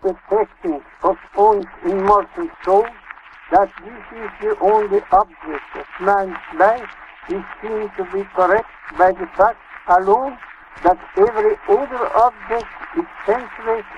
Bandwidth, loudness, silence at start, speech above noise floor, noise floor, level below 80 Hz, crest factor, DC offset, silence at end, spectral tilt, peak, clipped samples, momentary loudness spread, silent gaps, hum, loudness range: 7.8 kHz; -18 LUFS; 0.05 s; 22 dB; -39 dBFS; -46 dBFS; 18 dB; under 0.1%; 0 s; -7 dB/octave; -2 dBFS; under 0.1%; 15 LU; none; none; 3 LU